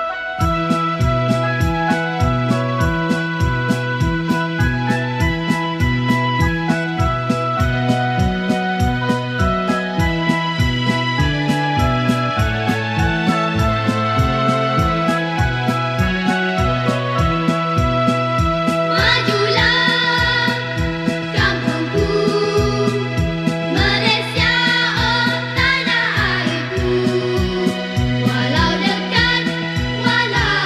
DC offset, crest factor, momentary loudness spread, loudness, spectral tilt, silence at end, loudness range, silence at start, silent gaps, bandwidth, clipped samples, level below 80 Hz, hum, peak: under 0.1%; 16 dB; 5 LU; -17 LUFS; -5.5 dB/octave; 0 s; 3 LU; 0 s; none; 14.5 kHz; under 0.1%; -30 dBFS; none; -2 dBFS